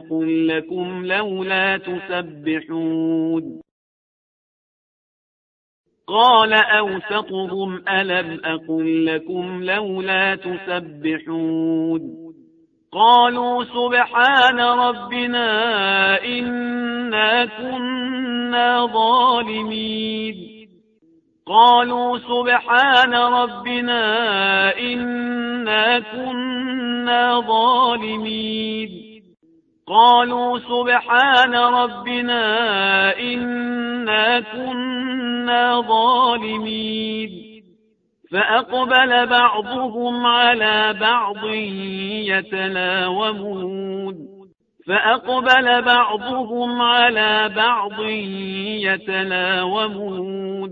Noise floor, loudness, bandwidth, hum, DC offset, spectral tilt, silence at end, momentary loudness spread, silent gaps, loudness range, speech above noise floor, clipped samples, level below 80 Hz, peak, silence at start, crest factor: -62 dBFS; -18 LUFS; 7.4 kHz; none; under 0.1%; -5.5 dB/octave; 0 s; 12 LU; 3.71-5.84 s; 6 LU; 43 dB; under 0.1%; -62 dBFS; 0 dBFS; 0 s; 18 dB